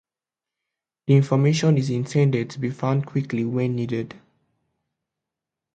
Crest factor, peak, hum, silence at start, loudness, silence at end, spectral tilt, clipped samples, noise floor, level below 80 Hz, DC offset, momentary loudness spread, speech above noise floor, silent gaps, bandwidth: 18 dB; -4 dBFS; none; 1.05 s; -22 LUFS; 1.6 s; -7.5 dB/octave; under 0.1%; -89 dBFS; -62 dBFS; under 0.1%; 10 LU; 68 dB; none; 8.8 kHz